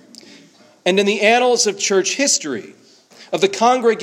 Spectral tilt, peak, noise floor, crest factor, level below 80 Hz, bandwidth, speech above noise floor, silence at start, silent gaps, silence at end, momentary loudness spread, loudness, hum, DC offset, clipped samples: -2 dB/octave; 0 dBFS; -48 dBFS; 18 dB; -72 dBFS; 15 kHz; 32 dB; 0.85 s; none; 0 s; 10 LU; -16 LUFS; none; under 0.1%; under 0.1%